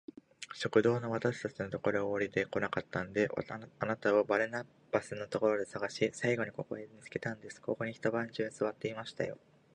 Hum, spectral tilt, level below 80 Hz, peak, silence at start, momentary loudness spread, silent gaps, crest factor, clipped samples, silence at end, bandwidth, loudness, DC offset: none; -5.5 dB/octave; -68 dBFS; -14 dBFS; 0.4 s; 12 LU; none; 22 dB; under 0.1%; 0.4 s; 11 kHz; -35 LUFS; under 0.1%